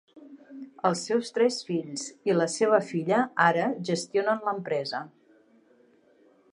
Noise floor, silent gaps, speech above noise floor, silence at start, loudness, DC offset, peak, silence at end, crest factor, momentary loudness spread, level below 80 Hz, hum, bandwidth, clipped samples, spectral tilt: -61 dBFS; none; 34 dB; 0.15 s; -27 LUFS; under 0.1%; -6 dBFS; 1.45 s; 22 dB; 13 LU; -80 dBFS; none; 11.5 kHz; under 0.1%; -4.5 dB/octave